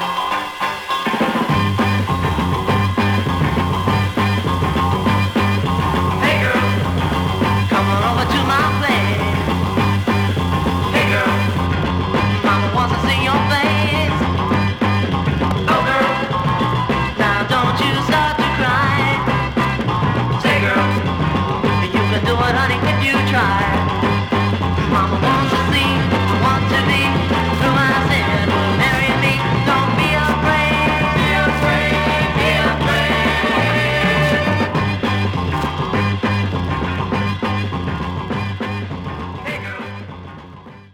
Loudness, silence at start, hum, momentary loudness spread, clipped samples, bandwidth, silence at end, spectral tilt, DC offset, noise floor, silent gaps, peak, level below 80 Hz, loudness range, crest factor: -17 LUFS; 0 s; none; 6 LU; under 0.1%; 17.5 kHz; 0.1 s; -6 dB/octave; under 0.1%; -38 dBFS; none; -2 dBFS; -34 dBFS; 3 LU; 14 dB